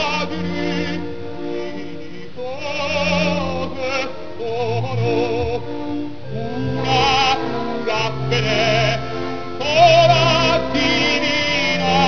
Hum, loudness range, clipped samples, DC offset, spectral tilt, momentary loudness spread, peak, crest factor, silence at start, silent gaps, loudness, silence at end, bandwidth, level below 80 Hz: none; 8 LU; under 0.1%; 3%; -5 dB/octave; 14 LU; -2 dBFS; 18 dB; 0 s; none; -18 LUFS; 0 s; 5.4 kHz; -42 dBFS